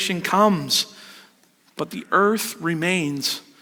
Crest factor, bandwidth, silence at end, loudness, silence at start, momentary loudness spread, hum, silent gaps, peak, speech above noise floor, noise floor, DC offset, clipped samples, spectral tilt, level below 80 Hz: 20 dB; over 20 kHz; 0.2 s; -21 LUFS; 0 s; 13 LU; none; none; -4 dBFS; 37 dB; -58 dBFS; under 0.1%; under 0.1%; -3.5 dB/octave; -66 dBFS